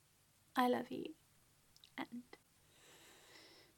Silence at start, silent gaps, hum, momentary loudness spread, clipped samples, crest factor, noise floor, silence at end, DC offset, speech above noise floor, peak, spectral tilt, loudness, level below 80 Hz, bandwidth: 0.55 s; none; none; 26 LU; under 0.1%; 26 dB; -73 dBFS; 0.3 s; under 0.1%; 32 dB; -20 dBFS; -4.5 dB/octave; -42 LUFS; -84 dBFS; 17.5 kHz